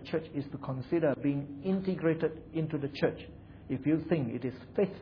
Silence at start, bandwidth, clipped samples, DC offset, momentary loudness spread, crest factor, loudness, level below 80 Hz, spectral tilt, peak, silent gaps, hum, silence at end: 0 s; 5.4 kHz; under 0.1%; under 0.1%; 9 LU; 18 dB; -33 LUFS; -60 dBFS; -9.5 dB/octave; -14 dBFS; none; none; 0 s